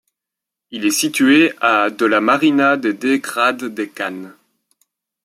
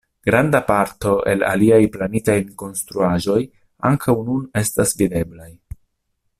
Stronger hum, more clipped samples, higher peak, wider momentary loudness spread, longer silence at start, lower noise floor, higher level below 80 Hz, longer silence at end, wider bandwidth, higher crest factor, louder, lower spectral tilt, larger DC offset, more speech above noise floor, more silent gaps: neither; neither; about the same, -2 dBFS vs -2 dBFS; first, 13 LU vs 10 LU; first, 0.7 s vs 0.25 s; first, -84 dBFS vs -71 dBFS; second, -68 dBFS vs -44 dBFS; about the same, 0.95 s vs 0.85 s; about the same, 15.5 kHz vs 16 kHz; about the same, 16 dB vs 18 dB; about the same, -16 LUFS vs -18 LUFS; second, -3 dB/octave vs -5.5 dB/octave; neither; first, 68 dB vs 53 dB; neither